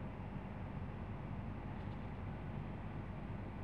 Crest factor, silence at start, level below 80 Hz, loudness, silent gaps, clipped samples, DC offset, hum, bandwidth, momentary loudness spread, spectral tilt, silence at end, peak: 14 dB; 0 s; -52 dBFS; -47 LUFS; none; under 0.1%; 0.1%; none; 6 kHz; 1 LU; -9 dB/octave; 0 s; -30 dBFS